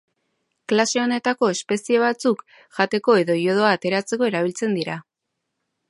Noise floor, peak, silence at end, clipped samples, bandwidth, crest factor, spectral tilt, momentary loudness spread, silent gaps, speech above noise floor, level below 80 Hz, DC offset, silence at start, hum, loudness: -79 dBFS; -4 dBFS; 0.9 s; under 0.1%; 11.5 kHz; 18 dB; -4.5 dB/octave; 9 LU; none; 59 dB; -72 dBFS; under 0.1%; 0.7 s; none; -21 LUFS